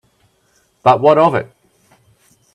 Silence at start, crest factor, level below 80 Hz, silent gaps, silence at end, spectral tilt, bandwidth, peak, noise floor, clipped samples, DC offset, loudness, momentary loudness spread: 0.85 s; 18 dB; -60 dBFS; none; 1.1 s; -7.5 dB/octave; 10.5 kHz; 0 dBFS; -59 dBFS; under 0.1%; under 0.1%; -13 LUFS; 13 LU